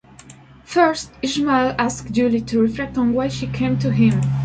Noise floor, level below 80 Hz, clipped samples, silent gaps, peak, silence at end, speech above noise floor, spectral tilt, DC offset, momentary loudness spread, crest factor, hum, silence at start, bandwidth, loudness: -44 dBFS; -44 dBFS; under 0.1%; none; -2 dBFS; 0 s; 26 dB; -6 dB/octave; under 0.1%; 6 LU; 16 dB; none; 0.25 s; 9.2 kHz; -19 LUFS